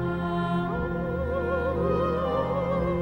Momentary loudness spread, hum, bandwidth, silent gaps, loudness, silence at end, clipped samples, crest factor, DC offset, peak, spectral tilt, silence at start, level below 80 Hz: 3 LU; none; 6 kHz; none; -27 LUFS; 0 s; under 0.1%; 14 dB; under 0.1%; -12 dBFS; -9 dB/octave; 0 s; -40 dBFS